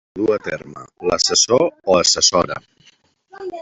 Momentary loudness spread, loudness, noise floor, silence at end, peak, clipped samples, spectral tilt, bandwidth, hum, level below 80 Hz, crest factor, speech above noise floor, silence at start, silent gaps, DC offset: 19 LU; -16 LUFS; -55 dBFS; 0 s; -2 dBFS; under 0.1%; -2 dB/octave; 8.4 kHz; none; -52 dBFS; 18 dB; 37 dB; 0.15 s; none; under 0.1%